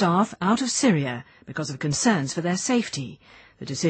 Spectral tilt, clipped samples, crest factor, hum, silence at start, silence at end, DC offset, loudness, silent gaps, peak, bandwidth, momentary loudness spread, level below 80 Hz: -4.5 dB/octave; under 0.1%; 16 dB; none; 0 s; 0 s; under 0.1%; -24 LUFS; none; -8 dBFS; 8.8 kHz; 14 LU; -62 dBFS